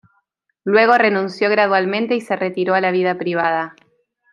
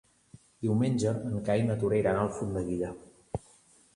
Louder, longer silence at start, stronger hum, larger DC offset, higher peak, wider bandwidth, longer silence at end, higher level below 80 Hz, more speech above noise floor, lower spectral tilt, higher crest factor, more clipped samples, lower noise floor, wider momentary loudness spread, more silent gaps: first, -17 LUFS vs -30 LUFS; about the same, 0.65 s vs 0.6 s; neither; neither; first, 0 dBFS vs -14 dBFS; about the same, 11.5 kHz vs 11.5 kHz; about the same, 0.6 s vs 0.6 s; second, -70 dBFS vs -54 dBFS; first, 51 dB vs 32 dB; about the same, -6.5 dB/octave vs -7.5 dB/octave; about the same, 18 dB vs 16 dB; neither; first, -68 dBFS vs -61 dBFS; second, 8 LU vs 14 LU; neither